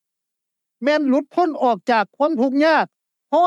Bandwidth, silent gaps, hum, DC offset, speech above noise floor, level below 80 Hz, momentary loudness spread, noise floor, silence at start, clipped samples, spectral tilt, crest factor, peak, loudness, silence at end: 10.5 kHz; none; none; under 0.1%; 63 dB; -90 dBFS; 5 LU; -81 dBFS; 0.8 s; under 0.1%; -5.5 dB/octave; 14 dB; -6 dBFS; -19 LUFS; 0 s